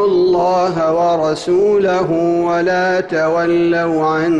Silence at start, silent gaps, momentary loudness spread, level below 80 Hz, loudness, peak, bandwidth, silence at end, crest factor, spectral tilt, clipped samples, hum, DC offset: 0 s; none; 3 LU; -50 dBFS; -15 LUFS; -6 dBFS; 9.4 kHz; 0 s; 8 dB; -6.5 dB/octave; under 0.1%; none; under 0.1%